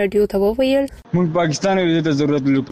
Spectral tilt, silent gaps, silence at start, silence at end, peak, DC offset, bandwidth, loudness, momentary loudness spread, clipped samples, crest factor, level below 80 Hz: -6 dB/octave; none; 0 s; 0 s; -6 dBFS; under 0.1%; 14 kHz; -18 LUFS; 3 LU; under 0.1%; 10 dB; -44 dBFS